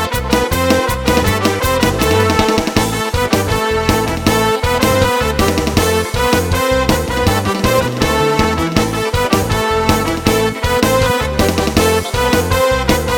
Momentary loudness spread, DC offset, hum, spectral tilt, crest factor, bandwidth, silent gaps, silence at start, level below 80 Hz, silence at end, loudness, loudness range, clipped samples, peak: 2 LU; under 0.1%; none; -4.5 dB/octave; 14 dB; 19 kHz; none; 0 s; -26 dBFS; 0 s; -14 LUFS; 1 LU; under 0.1%; 0 dBFS